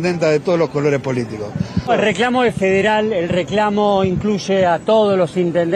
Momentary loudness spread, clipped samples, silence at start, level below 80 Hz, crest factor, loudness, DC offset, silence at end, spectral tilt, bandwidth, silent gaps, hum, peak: 7 LU; under 0.1%; 0 s; -46 dBFS; 12 dB; -16 LUFS; under 0.1%; 0 s; -6 dB/octave; 11 kHz; none; none; -4 dBFS